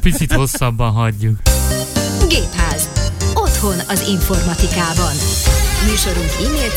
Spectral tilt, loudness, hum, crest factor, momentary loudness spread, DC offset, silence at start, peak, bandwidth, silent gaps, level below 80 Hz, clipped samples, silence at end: -4 dB/octave; -16 LUFS; none; 14 dB; 3 LU; under 0.1%; 0 s; 0 dBFS; 17 kHz; none; -18 dBFS; under 0.1%; 0 s